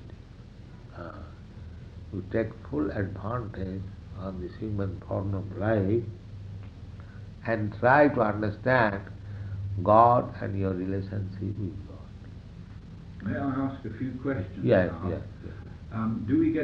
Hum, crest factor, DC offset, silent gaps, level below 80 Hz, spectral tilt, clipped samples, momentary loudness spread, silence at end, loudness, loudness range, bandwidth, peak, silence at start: none; 22 dB; under 0.1%; none; -48 dBFS; -9.5 dB/octave; under 0.1%; 23 LU; 0 s; -28 LUFS; 10 LU; 6.2 kHz; -6 dBFS; 0 s